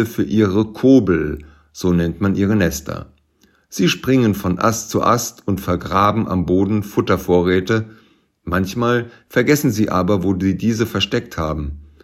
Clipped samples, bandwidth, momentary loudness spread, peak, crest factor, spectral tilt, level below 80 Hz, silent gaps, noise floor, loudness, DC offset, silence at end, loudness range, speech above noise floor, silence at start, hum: under 0.1%; 16 kHz; 8 LU; 0 dBFS; 18 dB; -6 dB/octave; -42 dBFS; none; -58 dBFS; -18 LUFS; under 0.1%; 0.2 s; 2 LU; 41 dB; 0 s; none